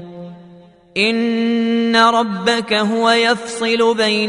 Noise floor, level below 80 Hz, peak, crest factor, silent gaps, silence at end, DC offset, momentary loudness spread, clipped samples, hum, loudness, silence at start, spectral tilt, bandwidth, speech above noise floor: -44 dBFS; -60 dBFS; 0 dBFS; 16 dB; none; 0 s; under 0.1%; 10 LU; under 0.1%; none; -15 LUFS; 0 s; -4 dB/octave; 11 kHz; 28 dB